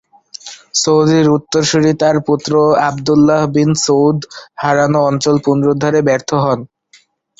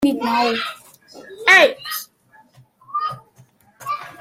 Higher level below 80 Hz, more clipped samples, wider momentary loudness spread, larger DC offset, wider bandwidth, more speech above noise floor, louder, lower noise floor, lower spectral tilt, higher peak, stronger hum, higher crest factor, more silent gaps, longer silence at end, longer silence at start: first, -50 dBFS vs -62 dBFS; neither; second, 9 LU vs 18 LU; neither; second, 8 kHz vs 16.5 kHz; about the same, 38 dB vs 37 dB; first, -13 LUFS vs -18 LUFS; about the same, -50 dBFS vs -53 dBFS; first, -5 dB/octave vs -2.5 dB/octave; about the same, 0 dBFS vs 0 dBFS; neither; second, 12 dB vs 20 dB; neither; first, 0.75 s vs 0.1 s; first, 0.45 s vs 0 s